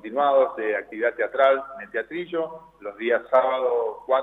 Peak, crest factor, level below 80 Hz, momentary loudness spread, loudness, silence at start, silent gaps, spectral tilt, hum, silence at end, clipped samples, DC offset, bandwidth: -6 dBFS; 16 dB; -68 dBFS; 11 LU; -24 LUFS; 0.05 s; none; -6 dB/octave; 50 Hz at -65 dBFS; 0 s; under 0.1%; under 0.1%; 4 kHz